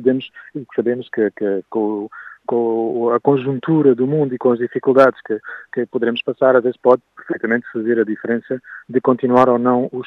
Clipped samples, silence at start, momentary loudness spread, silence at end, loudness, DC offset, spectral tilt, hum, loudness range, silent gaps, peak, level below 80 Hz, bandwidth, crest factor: under 0.1%; 0 s; 12 LU; 0 s; -18 LUFS; under 0.1%; -8.5 dB/octave; none; 3 LU; none; 0 dBFS; -68 dBFS; 6 kHz; 18 dB